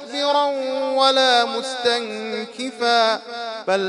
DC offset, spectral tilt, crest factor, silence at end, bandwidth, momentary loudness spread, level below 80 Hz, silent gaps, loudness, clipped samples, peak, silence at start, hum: under 0.1%; -2 dB/octave; 18 dB; 0 s; 11 kHz; 12 LU; -78 dBFS; none; -20 LUFS; under 0.1%; -2 dBFS; 0 s; none